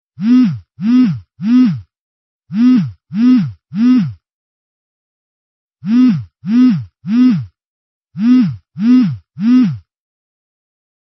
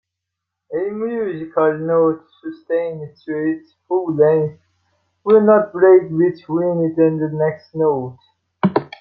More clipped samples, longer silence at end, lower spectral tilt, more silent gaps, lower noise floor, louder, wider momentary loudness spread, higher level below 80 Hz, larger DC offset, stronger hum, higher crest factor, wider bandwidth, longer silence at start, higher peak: neither; first, 1.25 s vs 0.15 s; second, -8 dB/octave vs -11 dB/octave; first, 1.99-2.39 s, 4.33-5.69 s, 7.66-8.01 s vs none; first, under -90 dBFS vs -81 dBFS; first, -13 LUFS vs -18 LUFS; second, 10 LU vs 15 LU; first, -56 dBFS vs -62 dBFS; neither; neither; about the same, 12 dB vs 16 dB; about the same, 6 kHz vs 5.6 kHz; second, 0.2 s vs 0.7 s; about the same, -2 dBFS vs -2 dBFS